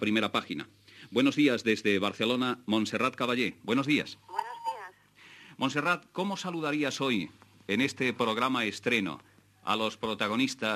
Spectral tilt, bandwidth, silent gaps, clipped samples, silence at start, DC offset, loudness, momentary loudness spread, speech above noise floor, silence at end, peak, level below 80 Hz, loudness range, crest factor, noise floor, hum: -4.5 dB/octave; 14 kHz; none; under 0.1%; 0 s; under 0.1%; -30 LUFS; 11 LU; 26 dB; 0 s; -12 dBFS; -76 dBFS; 4 LU; 18 dB; -56 dBFS; none